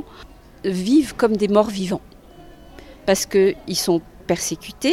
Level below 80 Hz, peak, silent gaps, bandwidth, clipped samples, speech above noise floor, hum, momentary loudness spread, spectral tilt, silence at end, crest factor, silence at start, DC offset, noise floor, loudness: -48 dBFS; -2 dBFS; none; 16.5 kHz; under 0.1%; 25 dB; none; 10 LU; -4.5 dB/octave; 0 s; 20 dB; 0 s; under 0.1%; -44 dBFS; -20 LUFS